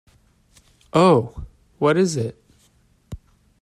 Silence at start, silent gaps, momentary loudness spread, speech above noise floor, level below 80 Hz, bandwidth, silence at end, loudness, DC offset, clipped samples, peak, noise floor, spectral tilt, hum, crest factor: 0.95 s; none; 25 LU; 41 dB; -48 dBFS; 12.5 kHz; 0.45 s; -19 LUFS; under 0.1%; under 0.1%; -4 dBFS; -59 dBFS; -6.5 dB/octave; none; 20 dB